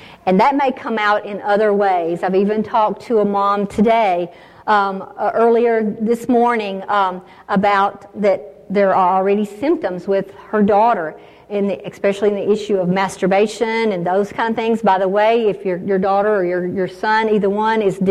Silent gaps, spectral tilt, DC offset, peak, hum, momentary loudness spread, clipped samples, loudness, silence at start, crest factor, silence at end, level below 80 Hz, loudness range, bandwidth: none; -6.5 dB/octave; under 0.1%; -4 dBFS; none; 7 LU; under 0.1%; -17 LUFS; 0 s; 12 dB; 0 s; -56 dBFS; 2 LU; 13 kHz